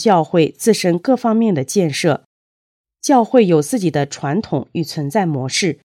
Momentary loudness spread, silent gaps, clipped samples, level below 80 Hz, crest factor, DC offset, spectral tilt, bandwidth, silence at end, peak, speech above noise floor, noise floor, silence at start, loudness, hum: 9 LU; 2.25-2.84 s; under 0.1%; -62 dBFS; 16 dB; under 0.1%; -5.5 dB/octave; 16.5 kHz; 0.25 s; 0 dBFS; over 74 dB; under -90 dBFS; 0 s; -16 LUFS; none